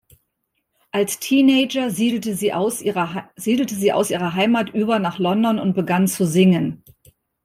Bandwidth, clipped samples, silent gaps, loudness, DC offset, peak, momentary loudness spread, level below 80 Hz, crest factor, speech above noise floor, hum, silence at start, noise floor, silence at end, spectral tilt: 16 kHz; under 0.1%; none; -19 LUFS; under 0.1%; -4 dBFS; 7 LU; -60 dBFS; 16 dB; 55 dB; none; 0.95 s; -74 dBFS; 0.7 s; -5 dB/octave